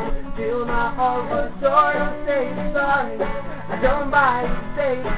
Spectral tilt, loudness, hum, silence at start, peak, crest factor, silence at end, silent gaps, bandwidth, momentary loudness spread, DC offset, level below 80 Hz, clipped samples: -9.5 dB/octave; -21 LUFS; none; 0 s; -2 dBFS; 18 dB; 0 s; none; 4 kHz; 9 LU; 3%; -34 dBFS; under 0.1%